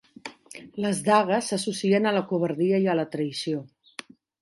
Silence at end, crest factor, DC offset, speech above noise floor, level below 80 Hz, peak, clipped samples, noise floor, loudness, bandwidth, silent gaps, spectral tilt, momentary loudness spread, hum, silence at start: 0.75 s; 18 dB; under 0.1%; 21 dB; -74 dBFS; -6 dBFS; under 0.1%; -45 dBFS; -25 LUFS; 11.5 kHz; none; -5 dB/octave; 20 LU; none; 0.25 s